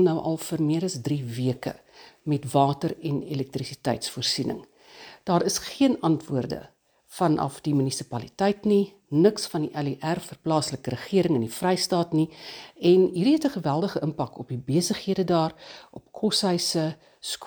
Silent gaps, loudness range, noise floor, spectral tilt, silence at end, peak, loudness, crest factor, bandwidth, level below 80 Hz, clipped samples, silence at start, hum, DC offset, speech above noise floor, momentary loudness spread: none; 4 LU; -48 dBFS; -5.5 dB/octave; 0 s; -6 dBFS; -25 LUFS; 18 dB; over 20 kHz; -62 dBFS; under 0.1%; 0 s; none; under 0.1%; 23 dB; 12 LU